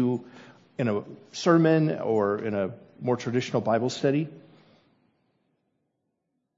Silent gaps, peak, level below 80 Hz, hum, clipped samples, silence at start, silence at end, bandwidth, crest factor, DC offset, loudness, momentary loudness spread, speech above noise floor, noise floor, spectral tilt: none; -8 dBFS; -74 dBFS; none; under 0.1%; 0 s; 2.15 s; 7.8 kHz; 20 dB; under 0.1%; -26 LUFS; 13 LU; 53 dB; -79 dBFS; -6.5 dB/octave